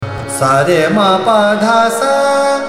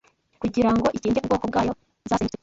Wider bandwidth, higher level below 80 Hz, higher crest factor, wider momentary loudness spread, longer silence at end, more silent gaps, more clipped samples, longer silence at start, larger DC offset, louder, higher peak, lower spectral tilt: first, 16 kHz vs 7.8 kHz; about the same, -46 dBFS vs -46 dBFS; about the same, 12 dB vs 16 dB; second, 2 LU vs 8 LU; second, 0 s vs 0.15 s; neither; neither; second, 0 s vs 0.4 s; neither; first, -11 LUFS vs -24 LUFS; first, 0 dBFS vs -8 dBFS; second, -4.5 dB/octave vs -6.5 dB/octave